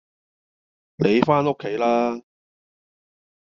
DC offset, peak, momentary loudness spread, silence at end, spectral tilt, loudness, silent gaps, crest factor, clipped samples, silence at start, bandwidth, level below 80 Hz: under 0.1%; -2 dBFS; 8 LU; 1.3 s; -5.5 dB/octave; -21 LUFS; none; 22 dB; under 0.1%; 1 s; 7.2 kHz; -62 dBFS